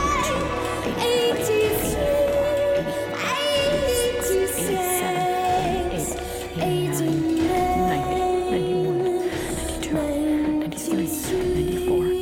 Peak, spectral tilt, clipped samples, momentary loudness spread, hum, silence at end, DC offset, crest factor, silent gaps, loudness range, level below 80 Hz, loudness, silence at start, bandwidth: -10 dBFS; -4.5 dB/octave; under 0.1%; 5 LU; none; 0 s; under 0.1%; 12 dB; none; 2 LU; -38 dBFS; -23 LUFS; 0 s; 17 kHz